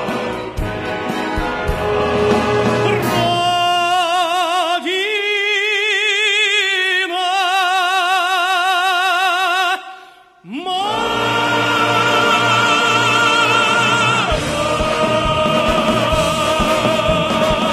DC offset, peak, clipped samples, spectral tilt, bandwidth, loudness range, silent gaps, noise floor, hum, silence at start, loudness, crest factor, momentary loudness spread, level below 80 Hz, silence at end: under 0.1%; -2 dBFS; under 0.1%; -3.5 dB/octave; 15.5 kHz; 4 LU; none; -42 dBFS; none; 0 s; -15 LUFS; 14 dB; 8 LU; -36 dBFS; 0 s